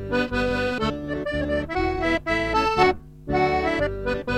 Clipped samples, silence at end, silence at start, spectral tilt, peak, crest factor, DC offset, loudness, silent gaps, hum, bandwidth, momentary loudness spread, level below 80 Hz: under 0.1%; 0 s; 0 s; -6 dB/octave; -4 dBFS; 20 dB; under 0.1%; -24 LUFS; none; none; 13 kHz; 7 LU; -38 dBFS